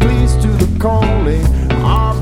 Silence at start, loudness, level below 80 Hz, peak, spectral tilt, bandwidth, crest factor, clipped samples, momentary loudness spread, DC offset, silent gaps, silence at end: 0 s; -14 LUFS; -14 dBFS; 0 dBFS; -7 dB/octave; 15 kHz; 12 dB; under 0.1%; 1 LU; under 0.1%; none; 0 s